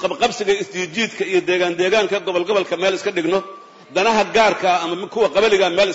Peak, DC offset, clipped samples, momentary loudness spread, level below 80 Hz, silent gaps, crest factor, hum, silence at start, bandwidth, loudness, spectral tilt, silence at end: -4 dBFS; under 0.1%; under 0.1%; 6 LU; -56 dBFS; none; 14 dB; none; 0 s; 8 kHz; -18 LUFS; -3.5 dB/octave; 0 s